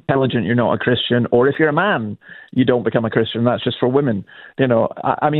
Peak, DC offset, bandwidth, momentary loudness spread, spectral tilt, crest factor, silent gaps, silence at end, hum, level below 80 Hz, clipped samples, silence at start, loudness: 0 dBFS; under 0.1%; 4.3 kHz; 7 LU; -10 dB/octave; 16 dB; none; 0 s; none; -54 dBFS; under 0.1%; 0.1 s; -17 LUFS